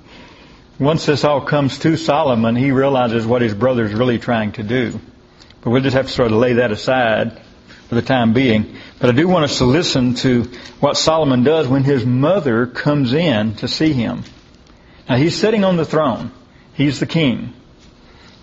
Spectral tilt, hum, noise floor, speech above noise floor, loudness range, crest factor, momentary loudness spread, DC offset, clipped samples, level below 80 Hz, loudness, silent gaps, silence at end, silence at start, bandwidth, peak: -6 dB/octave; none; -45 dBFS; 30 dB; 3 LU; 16 dB; 6 LU; under 0.1%; under 0.1%; -46 dBFS; -16 LUFS; none; 0.9 s; 0.1 s; 8 kHz; 0 dBFS